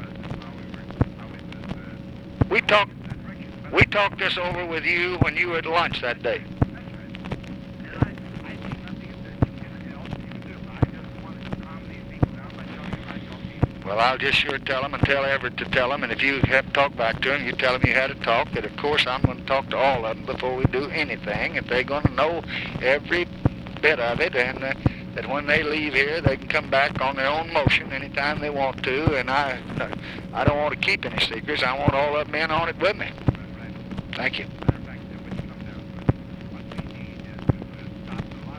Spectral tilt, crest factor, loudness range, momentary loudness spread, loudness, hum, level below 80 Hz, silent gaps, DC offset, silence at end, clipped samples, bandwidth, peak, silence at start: -6.5 dB/octave; 24 dB; 10 LU; 16 LU; -23 LUFS; none; -42 dBFS; none; under 0.1%; 0 s; under 0.1%; 12 kHz; -2 dBFS; 0 s